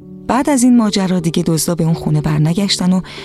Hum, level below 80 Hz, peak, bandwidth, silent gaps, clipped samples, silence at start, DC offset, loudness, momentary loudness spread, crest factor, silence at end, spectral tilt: none; -42 dBFS; -2 dBFS; 14 kHz; none; under 0.1%; 0 s; under 0.1%; -14 LUFS; 5 LU; 12 dB; 0 s; -5.5 dB/octave